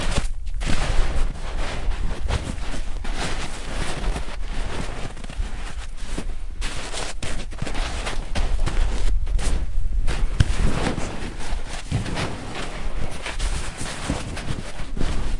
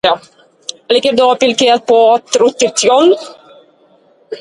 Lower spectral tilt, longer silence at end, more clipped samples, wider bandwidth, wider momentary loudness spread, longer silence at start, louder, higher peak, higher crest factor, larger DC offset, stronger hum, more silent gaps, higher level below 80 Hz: first, -4.5 dB/octave vs -2 dB/octave; about the same, 0 s vs 0 s; neither; about the same, 11.5 kHz vs 11.5 kHz; second, 7 LU vs 19 LU; about the same, 0 s vs 0.05 s; second, -29 LUFS vs -11 LUFS; about the same, -2 dBFS vs 0 dBFS; first, 20 dB vs 12 dB; first, 0.5% vs under 0.1%; neither; neither; first, -24 dBFS vs -58 dBFS